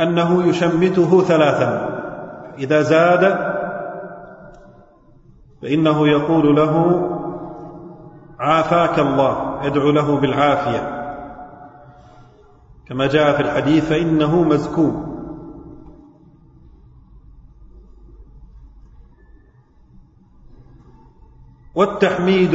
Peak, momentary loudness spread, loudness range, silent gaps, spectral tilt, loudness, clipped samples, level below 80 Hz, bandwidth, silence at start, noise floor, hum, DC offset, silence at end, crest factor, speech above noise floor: -2 dBFS; 20 LU; 6 LU; none; -7 dB/octave; -17 LUFS; under 0.1%; -46 dBFS; 8 kHz; 0 s; -50 dBFS; none; under 0.1%; 0 s; 18 dB; 35 dB